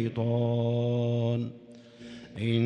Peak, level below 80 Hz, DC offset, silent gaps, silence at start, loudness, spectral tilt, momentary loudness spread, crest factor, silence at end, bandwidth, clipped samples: -14 dBFS; -66 dBFS; under 0.1%; none; 0 s; -29 LUFS; -9 dB/octave; 19 LU; 16 dB; 0 s; 6.6 kHz; under 0.1%